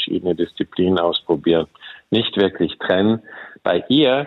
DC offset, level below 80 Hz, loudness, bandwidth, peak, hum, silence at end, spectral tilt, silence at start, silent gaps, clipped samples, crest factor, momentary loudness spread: under 0.1%; -58 dBFS; -19 LUFS; 5 kHz; -4 dBFS; none; 0 s; -8 dB/octave; 0 s; none; under 0.1%; 16 dB; 8 LU